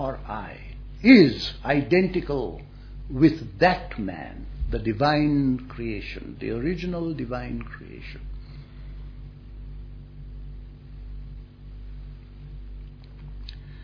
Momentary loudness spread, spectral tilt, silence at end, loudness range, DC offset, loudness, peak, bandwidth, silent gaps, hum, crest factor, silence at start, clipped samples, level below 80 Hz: 23 LU; -8 dB/octave; 0 s; 21 LU; under 0.1%; -23 LUFS; -2 dBFS; 5.4 kHz; none; none; 24 dB; 0 s; under 0.1%; -38 dBFS